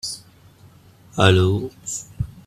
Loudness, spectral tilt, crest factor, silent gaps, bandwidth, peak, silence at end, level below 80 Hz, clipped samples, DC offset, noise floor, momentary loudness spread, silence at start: -20 LUFS; -5 dB/octave; 22 dB; none; 13.5 kHz; 0 dBFS; 0.05 s; -46 dBFS; under 0.1%; under 0.1%; -49 dBFS; 17 LU; 0.05 s